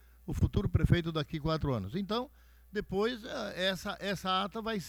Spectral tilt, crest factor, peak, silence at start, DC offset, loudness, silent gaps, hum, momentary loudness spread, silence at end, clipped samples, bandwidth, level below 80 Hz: -6 dB/octave; 20 dB; -14 dBFS; 0.25 s; under 0.1%; -33 LUFS; none; none; 9 LU; 0 s; under 0.1%; 20 kHz; -44 dBFS